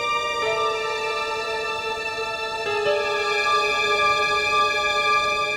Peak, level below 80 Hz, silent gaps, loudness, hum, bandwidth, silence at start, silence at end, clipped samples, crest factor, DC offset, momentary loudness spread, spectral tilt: -8 dBFS; -54 dBFS; none; -21 LUFS; none; 16.5 kHz; 0 s; 0 s; under 0.1%; 14 dB; under 0.1%; 7 LU; -1.5 dB/octave